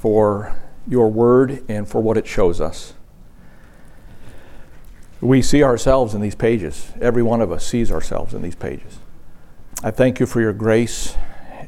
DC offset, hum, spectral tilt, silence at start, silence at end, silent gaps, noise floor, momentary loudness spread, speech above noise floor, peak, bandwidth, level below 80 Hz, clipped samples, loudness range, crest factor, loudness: under 0.1%; none; -6.5 dB/octave; 0 s; 0 s; none; -40 dBFS; 16 LU; 24 dB; 0 dBFS; 14 kHz; -30 dBFS; under 0.1%; 6 LU; 18 dB; -18 LUFS